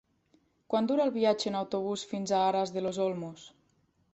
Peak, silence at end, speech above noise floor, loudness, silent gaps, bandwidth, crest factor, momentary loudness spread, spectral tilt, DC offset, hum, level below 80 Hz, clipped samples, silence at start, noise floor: -12 dBFS; 0.65 s; 41 dB; -30 LUFS; none; 8.2 kHz; 18 dB; 8 LU; -5 dB/octave; under 0.1%; none; -74 dBFS; under 0.1%; 0.7 s; -71 dBFS